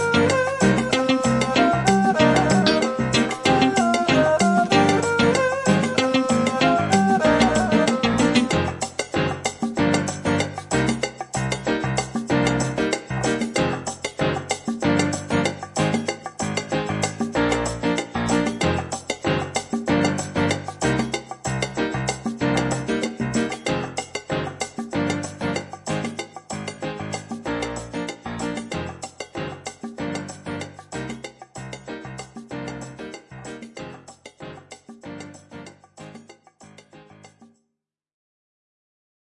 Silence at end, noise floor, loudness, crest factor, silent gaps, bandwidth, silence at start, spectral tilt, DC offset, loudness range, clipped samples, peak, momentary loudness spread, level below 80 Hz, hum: 1.95 s; -80 dBFS; -22 LUFS; 22 dB; none; 11.5 kHz; 0 s; -5 dB/octave; under 0.1%; 18 LU; under 0.1%; -2 dBFS; 18 LU; -48 dBFS; none